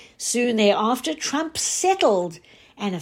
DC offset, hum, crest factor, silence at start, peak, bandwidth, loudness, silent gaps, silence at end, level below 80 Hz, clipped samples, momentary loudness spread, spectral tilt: under 0.1%; none; 16 dB; 0 s; -6 dBFS; 16 kHz; -21 LUFS; none; 0 s; -62 dBFS; under 0.1%; 9 LU; -3 dB/octave